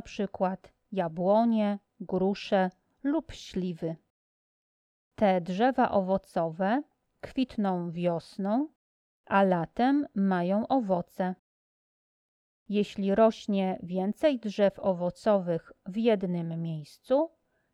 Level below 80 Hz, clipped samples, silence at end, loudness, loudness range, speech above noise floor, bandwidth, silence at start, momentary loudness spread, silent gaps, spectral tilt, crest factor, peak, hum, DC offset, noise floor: -62 dBFS; under 0.1%; 0.45 s; -29 LUFS; 4 LU; over 62 dB; 11 kHz; 0.05 s; 11 LU; 4.10-5.11 s, 8.75-9.24 s, 11.39-12.66 s; -7.5 dB/octave; 18 dB; -12 dBFS; none; under 0.1%; under -90 dBFS